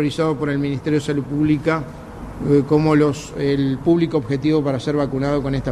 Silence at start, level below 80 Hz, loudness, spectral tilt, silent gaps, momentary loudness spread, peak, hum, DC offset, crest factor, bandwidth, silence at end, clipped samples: 0 s; -42 dBFS; -19 LUFS; -7.5 dB/octave; none; 7 LU; -4 dBFS; none; under 0.1%; 14 dB; 12 kHz; 0 s; under 0.1%